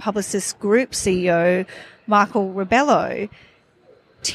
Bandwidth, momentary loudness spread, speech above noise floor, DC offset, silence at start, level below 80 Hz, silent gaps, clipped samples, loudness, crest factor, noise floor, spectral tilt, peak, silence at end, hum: 15 kHz; 12 LU; 34 dB; under 0.1%; 0 s; -52 dBFS; none; under 0.1%; -19 LUFS; 18 dB; -54 dBFS; -4 dB/octave; -4 dBFS; 0 s; none